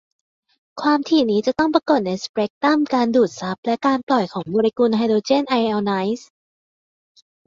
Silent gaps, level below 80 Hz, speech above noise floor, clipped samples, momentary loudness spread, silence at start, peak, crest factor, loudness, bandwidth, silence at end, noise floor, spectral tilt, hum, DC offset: 2.29-2.34 s, 2.50-2.61 s, 3.58-3.63 s, 4.03-4.07 s; -60 dBFS; over 71 dB; under 0.1%; 7 LU; 0.75 s; -2 dBFS; 18 dB; -19 LUFS; 7.6 kHz; 1.25 s; under -90 dBFS; -5.5 dB/octave; none; under 0.1%